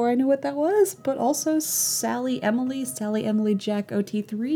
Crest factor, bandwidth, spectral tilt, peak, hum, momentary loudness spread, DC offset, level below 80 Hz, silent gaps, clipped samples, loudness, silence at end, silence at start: 14 dB; over 20 kHz; -4 dB/octave; -10 dBFS; none; 6 LU; under 0.1%; -76 dBFS; none; under 0.1%; -24 LUFS; 0 s; 0 s